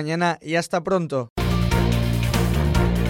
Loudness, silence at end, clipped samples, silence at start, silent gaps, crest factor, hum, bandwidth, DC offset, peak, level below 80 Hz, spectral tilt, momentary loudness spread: -22 LUFS; 0 s; under 0.1%; 0 s; 1.30-1.36 s; 14 dB; none; 17 kHz; under 0.1%; -6 dBFS; -28 dBFS; -6 dB/octave; 4 LU